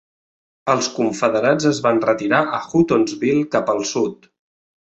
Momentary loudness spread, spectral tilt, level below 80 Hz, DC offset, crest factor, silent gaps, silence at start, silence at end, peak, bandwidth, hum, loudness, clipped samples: 4 LU; -5 dB/octave; -58 dBFS; under 0.1%; 18 dB; none; 0.65 s; 0.8 s; -2 dBFS; 8.2 kHz; none; -18 LUFS; under 0.1%